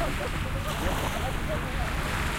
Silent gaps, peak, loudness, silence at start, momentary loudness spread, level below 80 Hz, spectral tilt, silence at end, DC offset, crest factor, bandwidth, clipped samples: none; -14 dBFS; -30 LUFS; 0 s; 2 LU; -34 dBFS; -4.5 dB/octave; 0 s; under 0.1%; 14 dB; 17 kHz; under 0.1%